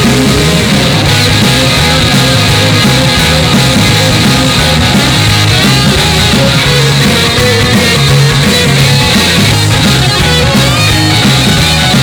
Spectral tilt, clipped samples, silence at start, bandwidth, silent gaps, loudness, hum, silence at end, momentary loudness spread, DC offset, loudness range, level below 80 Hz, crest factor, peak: -4 dB/octave; under 0.1%; 0 s; over 20 kHz; none; -6 LUFS; none; 0 s; 1 LU; under 0.1%; 0 LU; -22 dBFS; 6 dB; 0 dBFS